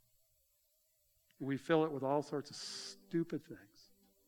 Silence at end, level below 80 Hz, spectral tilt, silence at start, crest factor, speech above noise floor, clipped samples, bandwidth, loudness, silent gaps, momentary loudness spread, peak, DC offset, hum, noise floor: 0.65 s; -84 dBFS; -5.5 dB/octave; 1.4 s; 22 dB; 38 dB; under 0.1%; 20 kHz; -39 LUFS; none; 13 LU; -18 dBFS; under 0.1%; none; -77 dBFS